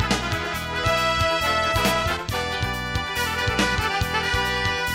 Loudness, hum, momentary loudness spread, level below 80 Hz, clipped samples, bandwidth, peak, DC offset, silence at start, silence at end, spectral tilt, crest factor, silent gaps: -22 LUFS; none; 5 LU; -36 dBFS; under 0.1%; 16 kHz; -8 dBFS; under 0.1%; 0 s; 0 s; -3.5 dB/octave; 16 dB; none